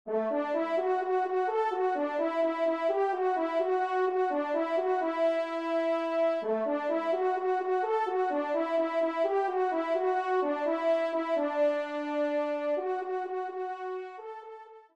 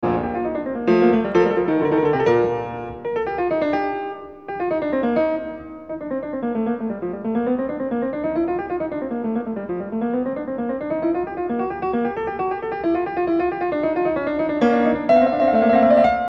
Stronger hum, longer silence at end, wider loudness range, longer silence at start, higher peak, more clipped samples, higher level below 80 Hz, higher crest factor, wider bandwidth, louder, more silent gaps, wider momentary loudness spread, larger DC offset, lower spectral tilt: neither; first, 0.15 s vs 0 s; second, 2 LU vs 5 LU; about the same, 0.05 s vs 0 s; second, -16 dBFS vs -4 dBFS; neither; second, -82 dBFS vs -50 dBFS; about the same, 12 dB vs 16 dB; first, 8.4 kHz vs 6.8 kHz; second, -30 LUFS vs -21 LUFS; neither; second, 6 LU vs 11 LU; second, under 0.1% vs 0.1%; second, -5 dB/octave vs -8 dB/octave